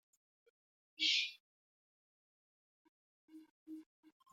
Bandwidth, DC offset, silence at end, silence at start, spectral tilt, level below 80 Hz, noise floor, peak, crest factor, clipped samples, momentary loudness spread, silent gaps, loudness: 16 kHz; under 0.1%; 0.5 s; 1 s; 2.5 dB/octave; under -90 dBFS; under -90 dBFS; -20 dBFS; 26 dB; under 0.1%; 22 LU; 1.40-3.28 s, 3.51-3.66 s; -35 LUFS